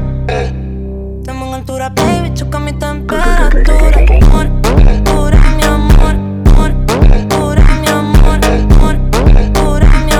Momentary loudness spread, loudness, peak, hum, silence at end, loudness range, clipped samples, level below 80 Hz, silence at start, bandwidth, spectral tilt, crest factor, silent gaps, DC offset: 10 LU; -11 LUFS; 0 dBFS; none; 0 s; 5 LU; under 0.1%; -8 dBFS; 0 s; 14.5 kHz; -6 dB/octave; 8 dB; none; under 0.1%